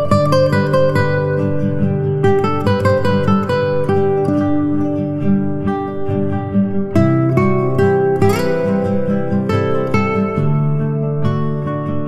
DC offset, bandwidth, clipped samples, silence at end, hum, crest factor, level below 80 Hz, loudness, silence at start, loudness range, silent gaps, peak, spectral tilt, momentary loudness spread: under 0.1%; 13 kHz; under 0.1%; 0 s; none; 14 dB; -42 dBFS; -16 LUFS; 0 s; 2 LU; none; -2 dBFS; -8.5 dB/octave; 5 LU